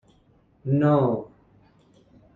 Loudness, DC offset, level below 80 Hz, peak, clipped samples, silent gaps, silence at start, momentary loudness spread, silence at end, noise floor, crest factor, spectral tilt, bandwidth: -23 LUFS; under 0.1%; -60 dBFS; -8 dBFS; under 0.1%; none; 0.65 s; 18 LU; 1.1 s; -60 dBFS; 18 dB; -11 dB/octave; 4.2 kHz